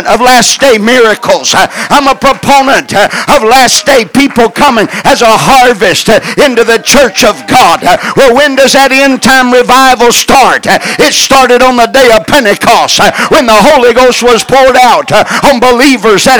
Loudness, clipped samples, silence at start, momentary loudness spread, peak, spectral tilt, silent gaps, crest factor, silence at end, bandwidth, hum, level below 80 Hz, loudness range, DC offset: -4 LUFS; 30%; 0 s; 4 LU; 0 dBFS; -2.5 dB/octave; none; 4 dB; 0 s; over 20 kHz; none; -32 dBFS; 1 LU; 2%